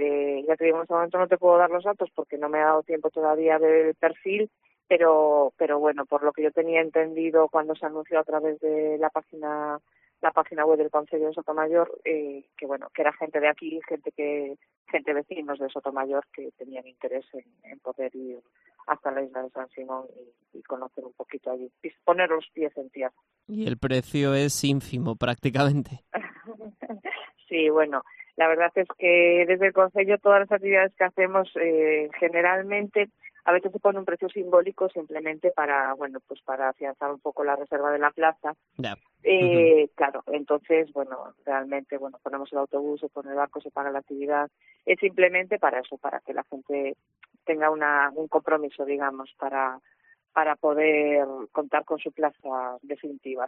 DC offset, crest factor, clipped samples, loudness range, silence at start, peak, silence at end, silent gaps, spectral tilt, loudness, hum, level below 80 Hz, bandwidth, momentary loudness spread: under 0.1%; 20 dB; under 0.1%; 9 LU; 0 s; -4 dBFS; 0 s; 14.77-14.85 s; -4 dB/octave; -25 LUFS; none; -66 dBFS; 5.2 kHz; 15 LU